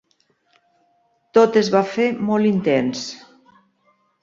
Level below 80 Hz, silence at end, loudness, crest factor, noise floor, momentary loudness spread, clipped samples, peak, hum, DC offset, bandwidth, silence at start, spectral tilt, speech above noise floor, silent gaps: -64 dBFS; 1.05 s; -18 LUFS; 20 dB; -64 dBFS; 14 LU; under 0.1%; -2 dBFS; none; under 0.1%; 7.6 kHz; 1.35 s; -5.5 dB/octave; 47 dB; none